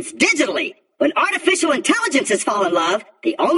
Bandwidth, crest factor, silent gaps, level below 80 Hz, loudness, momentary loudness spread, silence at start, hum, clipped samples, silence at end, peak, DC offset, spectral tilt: 12 kHz; 16 dB; none; -70 dBFS; -18 LUFS; 6 LU; 0 s; none; under 0.1%; 0 s; -2 dBFS; under 0.1%; -2 dB/octave